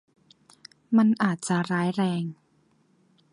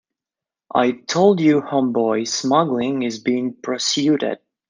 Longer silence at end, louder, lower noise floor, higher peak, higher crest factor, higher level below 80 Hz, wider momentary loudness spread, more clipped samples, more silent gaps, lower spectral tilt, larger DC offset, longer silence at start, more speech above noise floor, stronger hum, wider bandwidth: first, 1 s vs 0.35 s; second, -25 LUFS vs -19 LUFS; second, -65 dBFS vs -89 dBFS; second, -10 dBFS vs -2 dBFS; about the same, 18 dB vs 18 dB; second, -74 dBFS vs -66 dBFS; about the same, 8 LU vs 7 LU; neither; neither; first, -6 dB/octave vs -4.5 dB/octave; neither; first, 0.9 s vs 0.75 s; second, 41 dB vs 70 dB; neither; first, 11.5 kHz vs 9.8 kHz